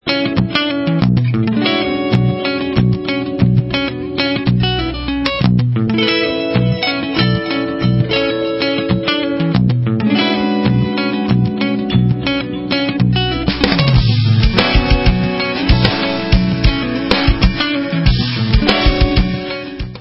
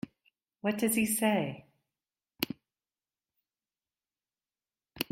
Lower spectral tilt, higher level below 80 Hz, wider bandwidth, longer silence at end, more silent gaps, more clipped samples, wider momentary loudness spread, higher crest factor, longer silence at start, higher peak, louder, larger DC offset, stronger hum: first, -8 dB/octave vs -3.5 dB/octave; first, -22 dBFS vs -70 dBFS; second, 8 kHz vs 16 kHz; about the same, 0 s vs 0.1 s; neither; neither; second, 5 LU vs 19 LU; second, 14 dB vs 26 dB; second, 0.05 s vs 0.65 s; first, 0 dBFS vs -10 dBFS; first, -15 LUFS vs -31 LUFS; neither; neither